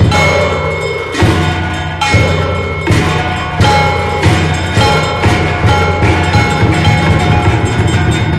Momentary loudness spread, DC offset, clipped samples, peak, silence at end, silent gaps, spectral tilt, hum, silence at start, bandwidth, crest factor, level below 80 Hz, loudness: 5 LU; under 0.1%; under 0.1%; 0 dBFS; 0 s; none; -5.5 dB/octave; none; 0 s; 13 kHz; 10 dB; -24 dBFS; -11 LUFS